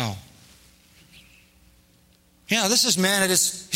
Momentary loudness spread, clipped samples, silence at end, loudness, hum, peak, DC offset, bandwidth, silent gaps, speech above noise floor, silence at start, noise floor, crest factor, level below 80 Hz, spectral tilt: 11 LU; under 0.1%; 0 s; -20 LUFS; none; -6 dBFS; under 0.1%; 16 kHz; none; 37 dB; 0 s; -59 dBFS; 20 dB; -62 dBFS; -2 dB/octave